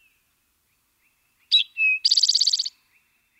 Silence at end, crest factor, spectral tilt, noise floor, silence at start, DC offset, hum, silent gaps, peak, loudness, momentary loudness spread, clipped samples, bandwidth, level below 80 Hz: 0.7 s; 18 dB; 7.5 dB/octave; -69 dBFS; 1.5 s; under 0.1%; none; none; -8 dBFS; -18 LUFS; 7 LU; under 0.1%; 16 kHz; -82 dBFS